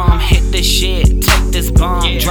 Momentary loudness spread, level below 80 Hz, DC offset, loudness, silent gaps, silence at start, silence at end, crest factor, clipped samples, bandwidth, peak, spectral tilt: 2 LU; -12 dBFS; under 0.1%; -13 LUFS; none; 0 s; 0 s; 10 dB; under 0.1%; over 20 kHz; 0 dBFS; -4 dB/octave